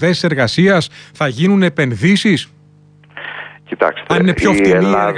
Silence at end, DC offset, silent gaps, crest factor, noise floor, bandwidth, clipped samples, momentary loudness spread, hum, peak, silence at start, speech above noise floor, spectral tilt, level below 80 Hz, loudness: 0 s; under 0.1%; none; 12 dB; -46 dBFS; 10.5 kHz; under 0.1%; 16 LU; 50 Hz at -35 dBFS; -2 dBFS; 0 s; 33 dB; -6 dB/octave; -42 dBFS; -13 LUFS